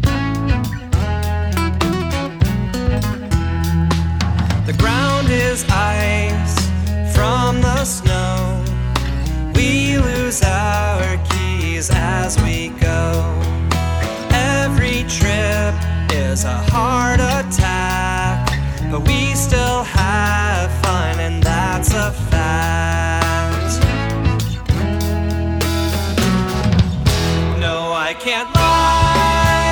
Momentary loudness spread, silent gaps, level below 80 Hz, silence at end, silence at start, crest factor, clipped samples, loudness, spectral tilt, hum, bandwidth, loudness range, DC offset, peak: 5 LU; none; -22 dBFS; 0 s; 0 s; 16 dB; under 0.1%; -17 LUFS; -5 dB/octave; none; over 20 kHz; 2 LU; under 0.1%; 0 dBFS